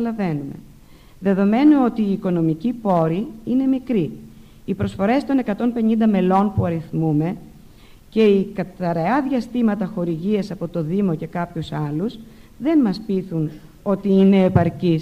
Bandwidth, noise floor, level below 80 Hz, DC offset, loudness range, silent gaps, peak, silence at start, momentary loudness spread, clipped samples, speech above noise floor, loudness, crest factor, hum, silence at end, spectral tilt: 9 kHz; -45 dBFS; -48 dBFS; under 0.1%; 4 LU; none; -6 dBFS; 0 s; 11 LU; under 0.1%; 26 dB; -20 LUFS; 14 dB; none; 0 s; -9 dB/octave